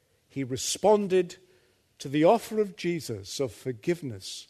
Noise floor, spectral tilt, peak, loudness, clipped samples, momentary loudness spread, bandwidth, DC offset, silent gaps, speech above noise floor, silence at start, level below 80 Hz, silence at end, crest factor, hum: -64 dBFS; -5 dB/octave; -8 dBFS; -28 LUFS; under 0.1%; 14 LU; 13.5 kHz; under 0.1%; none; 37 dB; 0.35 s; -68 dBFS; 0.05 s; 20 dB; none